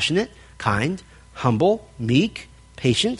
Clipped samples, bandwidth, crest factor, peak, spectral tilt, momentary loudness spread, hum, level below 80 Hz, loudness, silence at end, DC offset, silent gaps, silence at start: under 0.1%; 11.5 kHz; 18 dB; -4 dBFS; -5.5 dB/octave; 13 LU; none; -48 dBFS; -22 LUFS; 0 s; under 0.1%; none; 0 s